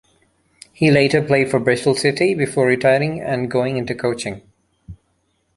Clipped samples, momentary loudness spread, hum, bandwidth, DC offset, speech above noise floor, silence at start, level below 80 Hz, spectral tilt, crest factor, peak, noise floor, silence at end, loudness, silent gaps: under 0.1%; 8 LU; none; 11.5 kHz; under 0.1%; 49 dB; 0.8 s; -52 dBFS; -5.5 dB/octave; 18 dB; -2 dBFS; -66 dBFS; 0.65 s; -18 LUFS; none